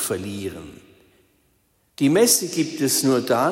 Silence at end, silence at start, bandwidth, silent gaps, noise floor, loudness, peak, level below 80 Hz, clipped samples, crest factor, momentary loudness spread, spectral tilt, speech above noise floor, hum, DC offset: 0 s; 0 s; 16.5 kHz; none; -64 dBFS; -20 LUFS; -4 dBFS; -60 dBFS; under 0.1%; 18 dB; 15 LU; -3.5 dB/octave; 44 dB; none; under 0.1%